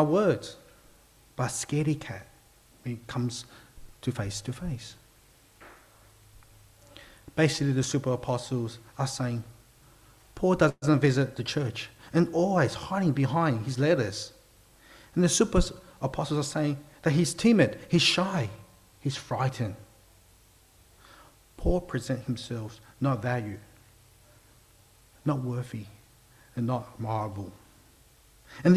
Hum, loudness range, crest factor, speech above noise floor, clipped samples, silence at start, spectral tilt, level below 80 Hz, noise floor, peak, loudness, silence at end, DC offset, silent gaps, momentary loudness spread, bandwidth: none; 10 LU; 20 dB; 32 dB; under 0.1%; 0 s; -5.5 dB/octave; -46 dBFS; -59 dBFS; -8 dBFS; -28 LUFS; 0 s; under 0.1%; none; 17 LU; 15 kHz